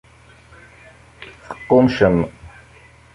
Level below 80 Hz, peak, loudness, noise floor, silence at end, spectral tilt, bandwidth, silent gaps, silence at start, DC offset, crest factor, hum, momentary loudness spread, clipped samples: -44 dBFS; -2 dBFS; -16 LUFS; -47 dBFS; 0.65 s; -8 dB/octave; 10.5 kHz; none; 1.2 s; under 0.1%; 20 dB; none; 25 LU; under 0.1%